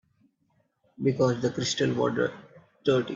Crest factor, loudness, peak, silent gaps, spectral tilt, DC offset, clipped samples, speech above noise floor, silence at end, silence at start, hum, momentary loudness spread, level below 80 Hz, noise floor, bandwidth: 18 dB; -27 LUFS; -12 dBFS; none; -5 dB/octave; under 0.1%; under 0.1%; 45 dB; 0 s; 1 s; none; 5 LU; -64 dBFS; -71 dBFS; 7.8 kHz